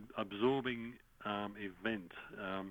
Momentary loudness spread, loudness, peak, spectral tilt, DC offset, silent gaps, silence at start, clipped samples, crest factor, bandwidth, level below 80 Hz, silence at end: 12 LU; -40 LUFS; -22 dBFS; -7 dB/octave; under 0.1%; none; 0 s; under 0.1%; 18 dB; 19 kHz; -70 dBFS; 0 s